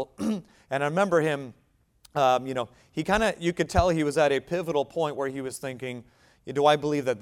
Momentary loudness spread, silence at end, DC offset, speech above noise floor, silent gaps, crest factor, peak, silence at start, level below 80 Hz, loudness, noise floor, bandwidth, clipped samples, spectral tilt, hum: 12 LU; 0 s; under 0.1%; 35 dB; none; 20 dB; -8 dBFS; 0 s; -46 dBFS; -26 LUFS; -61 dBFS; 16 kHz; under 0.1%; -5.5 dB/octave; none